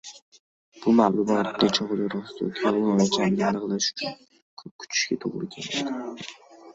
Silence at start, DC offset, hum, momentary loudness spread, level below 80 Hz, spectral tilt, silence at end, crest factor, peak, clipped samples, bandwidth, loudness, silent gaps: 0.05 s; under 0.1%; none; 14 LU; -64 dBFS; -4.5 dB/octave; 0 s; 18 dB; -6 dBFS; under 0.1%; 8 kHz; -25 LUFS; 0.22-0.32 s, 0.39-0.72 s, 4.42-4.57 s, 4.71-4.79 s